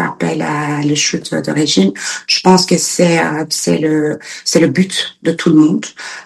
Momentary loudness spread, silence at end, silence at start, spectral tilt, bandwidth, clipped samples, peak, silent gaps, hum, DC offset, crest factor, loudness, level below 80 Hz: 8 LU; 0 s; 0 s; -4 dB/octave; 12.5 kHz; under 0.1%; 0 dBFS; none; none; under 0.1%; 14 dB; -13 LUFS; -56 dBFS